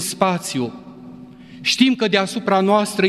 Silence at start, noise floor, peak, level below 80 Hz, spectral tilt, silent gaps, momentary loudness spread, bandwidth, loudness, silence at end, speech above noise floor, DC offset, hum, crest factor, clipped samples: 0 s; -39 dBFS; -2 dBFS; -62 dBFS; -4 dB/octave; none; 23 LU; 14.5 kHz; -18 LUFS; 0 s; 21 dB; under 0.1%; none; 18 dB; under 0.1%